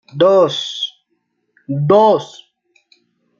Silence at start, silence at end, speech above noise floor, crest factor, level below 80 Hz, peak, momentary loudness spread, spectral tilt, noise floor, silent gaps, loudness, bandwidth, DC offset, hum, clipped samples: 0.15 s; 1.15 s; 55 dB; 14 dB; -62 dBFS; -2 dBFS; 14 LU; -6 dB/octave; -68 dBFS; none; -14 LUFS; 7.4 kHz; under 0.1%; none; under 0.1%